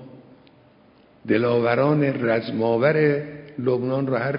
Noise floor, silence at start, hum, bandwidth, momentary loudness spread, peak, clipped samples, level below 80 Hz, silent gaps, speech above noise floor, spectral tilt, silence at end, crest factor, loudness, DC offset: -54 dBFS; 0 s; none; 5.4 kHz; 9 LU; -6 dBFS; under 0.1%; -64 dBFS; none; 33 dB; -12 dB/octave; 0 s; 18 dB; -21 LUFS; under 0.1%